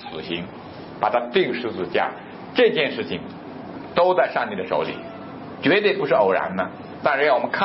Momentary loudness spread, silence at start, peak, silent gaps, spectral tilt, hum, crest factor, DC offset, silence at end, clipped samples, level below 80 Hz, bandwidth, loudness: 18 LU; 0 s; -4 dBFS; none; -9.5 dB/octave; none; 18 dB; under 0.1%; 0 s; under 0.1%; -62 dBFS; 5.8 kHz; -22 LUFS